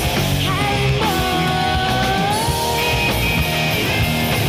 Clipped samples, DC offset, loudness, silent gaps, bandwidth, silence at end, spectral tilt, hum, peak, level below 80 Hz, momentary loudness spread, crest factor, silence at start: under 0.1%; under 0.1%; -17 LUFS; none; 16 kHz; 0 s; -4.5 dB/octave; none; -6 dBFS; -30 dBFS; 1 LU; 12 dB; 0 s